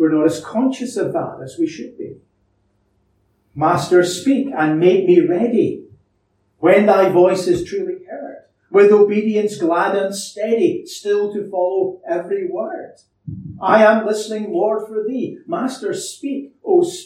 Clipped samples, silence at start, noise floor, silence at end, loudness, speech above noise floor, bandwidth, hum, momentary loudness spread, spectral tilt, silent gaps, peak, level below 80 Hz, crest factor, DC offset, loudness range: under 0.1%; 0 s; -64 dBFS; 0 s; -17 LUFS; 48 dB; 14.5 kHz; none; 17 LU; -5.5 dB/octave; none; -2 dBFS; -58 dBFS; 16 dB; under 0.1%; 6 LU